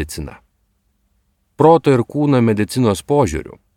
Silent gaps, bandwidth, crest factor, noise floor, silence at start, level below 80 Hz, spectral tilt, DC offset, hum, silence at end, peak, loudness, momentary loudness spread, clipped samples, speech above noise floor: none; 17 kHz; 16 dB; -64 dBFS; 0 s; -40 dBFS; -7 dB/octave; under 0.1%; none; 0.25 s; 0 dBFS; -15 LUFS; 16 LU; under 0.1%; 49 dB